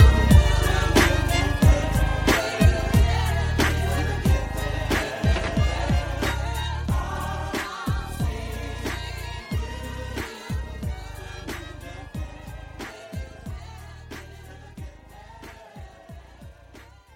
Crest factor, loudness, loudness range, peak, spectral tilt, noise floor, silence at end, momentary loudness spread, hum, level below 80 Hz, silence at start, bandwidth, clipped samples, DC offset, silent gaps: 22 dB; -24 LUFS; 19 LU; -2 dBFS; -5.5 dB/octave; -48 dBFS; 0.3 s; 22 LU; none; -28 dBFS; 0 s; 16.5 kHz; under 0.1%; under 0.1%; none